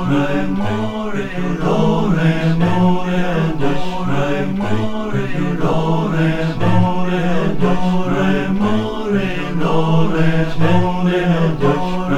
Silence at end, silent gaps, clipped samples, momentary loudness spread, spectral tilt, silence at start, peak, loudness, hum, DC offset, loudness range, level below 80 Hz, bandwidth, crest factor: 0 s; none; under 0.1%; 5 LU; -7.5 dB/octave; 0 s; 0 dBFS; -17 LUFS; none; under 0.1%; 2 LU; -32 dBFS; 9.4 kHz; 14 dB